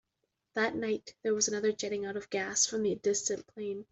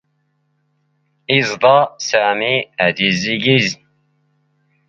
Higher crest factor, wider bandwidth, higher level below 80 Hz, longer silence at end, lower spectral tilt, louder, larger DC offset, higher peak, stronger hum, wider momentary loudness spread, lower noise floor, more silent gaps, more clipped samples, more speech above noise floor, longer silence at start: about the same, 18 dB vs 18 dB; about the same, 8.2 kHz vs 7.8 kHz; second, -72 dBFS vs -58 dBFS; second, 0.1 s vs 1.15 s; second, -2 dB/octave vs -4 dB/octave; second, -32 LUFS vs -15 LUFS; neither; second, -14 dBFS vs 0 dBFS; neither; first, 9 LU vs 6 LU; first, -83 dBFS vs -65 dBFS; neither; neither; about the same, 50 dB vs 50 dB; second, 0.55 s vs 1.3 s